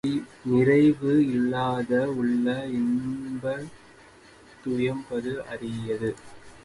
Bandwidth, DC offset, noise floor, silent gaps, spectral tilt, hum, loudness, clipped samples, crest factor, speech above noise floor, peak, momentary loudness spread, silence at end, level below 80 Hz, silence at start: 11.5 kHz; under 0.1%; -52 dBFS; none; -7.5 dB/octave; none; -26 LUFS; under 0.1%; 16 dB; 27 dB; -10 dBFS; 13 LU; 0.05 s; -58 dBFS; 0.05 s